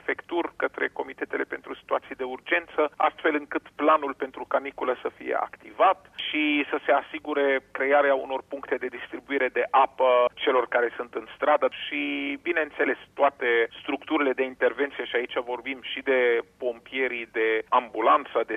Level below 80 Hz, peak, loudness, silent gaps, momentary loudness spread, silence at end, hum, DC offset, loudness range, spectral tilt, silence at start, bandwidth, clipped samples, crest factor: -68 dBFS; -10 dBFS; -26 LUFS; none; 10 LU; 0 s; none; under 0.1%; 2 LU; -5 dB/octave; 0.05 s; 6.6 kHz; under 0.1%; 16 dB